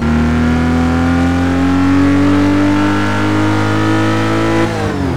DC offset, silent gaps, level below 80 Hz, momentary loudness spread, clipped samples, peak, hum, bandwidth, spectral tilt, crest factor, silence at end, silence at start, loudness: 7%; none; -26 dBFS; 3 LU; under 0.1%; -2 dBFS; none; 12.5 kHz; -7 dB/octave; 10 dB; 0 s; 0 s; -13 LUFS